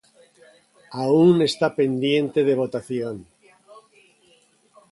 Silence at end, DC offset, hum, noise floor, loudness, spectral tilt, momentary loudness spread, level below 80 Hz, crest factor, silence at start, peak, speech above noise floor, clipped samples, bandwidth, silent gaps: 1.7 s; under 0.1%; none; -59 dBFS; -21 LUFS; -6.5 dB/octave; 14 LU; -64 dBFS; 18 dB; 0.9 s; -6 dBFS; 39 dB; under 0.1%; 11.5 kHz; none